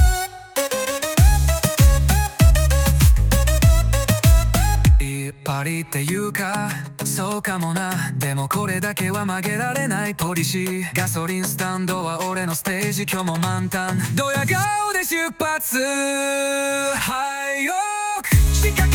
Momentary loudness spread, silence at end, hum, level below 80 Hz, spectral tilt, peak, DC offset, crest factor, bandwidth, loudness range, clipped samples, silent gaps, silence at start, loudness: 8 LU; 0 s; none; -22 dBFS; -4.5 dB/octave; -4 dBFS; under 0.1%; 16 dB; 18 kHz; 6 LU; under 0.1%; none; 0 s; -20 LUFS